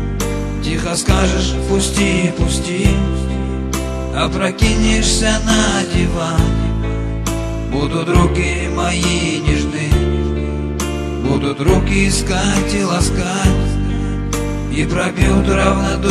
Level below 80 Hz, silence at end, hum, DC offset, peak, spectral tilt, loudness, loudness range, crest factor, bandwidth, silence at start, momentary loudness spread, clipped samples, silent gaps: -20 dBFS; 0 s; none; under 0.1%; 0 dBFS; -5 dB/octave; -16 LUFS; 2 LU; 16 dB; 13 kHz; 0 s; 7 LU; under 0.1%; none